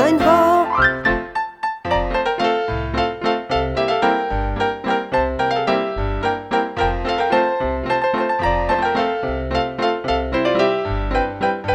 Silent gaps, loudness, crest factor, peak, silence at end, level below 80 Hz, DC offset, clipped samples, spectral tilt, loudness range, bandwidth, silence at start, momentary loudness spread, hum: none; -19 LUFS; 16 dB; -2 dBFS; 0 s; -30 dBFS; under 0.1%; under 0.1%; -6 dB/octave; 1 LU; 15.5 kHz; 0 s; 6 LU; none